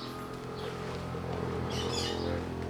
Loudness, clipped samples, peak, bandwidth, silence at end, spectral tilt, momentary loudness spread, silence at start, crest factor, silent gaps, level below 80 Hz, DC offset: -35 LUFS; under 0.1%; -20 dBFS; over 20 kHz; 0 s; -5 dB/octave; 8 LU; 0 s; 16 dB; none; -54 dBFS; under 0.1%